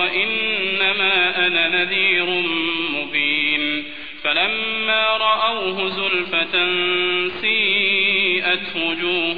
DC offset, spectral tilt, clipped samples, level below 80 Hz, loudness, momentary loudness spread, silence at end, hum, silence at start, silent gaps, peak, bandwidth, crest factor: 1%; -5 dB/octave; under 0.1%; -56 dBFS; -17 LUFS; 5 LU; 0 s; none; 0 s; none; -6 dBFS; 5 kHz; 14 dB